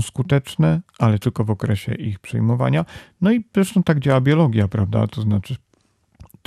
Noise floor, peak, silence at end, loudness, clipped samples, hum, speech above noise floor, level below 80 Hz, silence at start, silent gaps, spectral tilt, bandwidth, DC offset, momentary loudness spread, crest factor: -61 dBFS; -4 dBFS; 0.25 s; -19 LUFS; under 0.1%; none; 43 dB; -50 dBFS; 0 s; none; -7.5 dB/octave; 14 kHz; under 0.1%; 8 LU; 14 dB